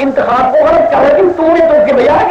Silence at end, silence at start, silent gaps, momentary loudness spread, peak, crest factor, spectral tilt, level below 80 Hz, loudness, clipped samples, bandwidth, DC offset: 0 s; 0 s; none; 2 LU; -2 dBFS; 6 dB; -6.5 dB/octave; -38 dBFS; -8 LUFS; under 0.1%; 7.6 kHz; under 0.1%